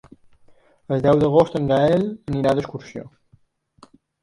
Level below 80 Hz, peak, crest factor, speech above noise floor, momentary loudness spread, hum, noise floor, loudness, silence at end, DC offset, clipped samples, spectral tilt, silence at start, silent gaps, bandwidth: -50 dBFS; -2 dBFS; 20 dB; 40 dB; 18 LU; none; -59 dBFS; -19 LUFS; 1.15 s; under 0.1%; under 0.1%; -8 dB/octave; 0.9 s; none; 11.5 kHz